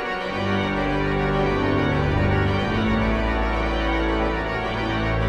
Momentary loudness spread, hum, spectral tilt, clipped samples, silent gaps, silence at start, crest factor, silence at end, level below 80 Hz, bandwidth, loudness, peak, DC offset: 3 LU; none; -7 dB/octave; under 0.1%; none; 0 s; 14 dB; 0 s; -30 dBFS; 9.4 kHz; -22 LUFS; -8 dBFS; under 0.1%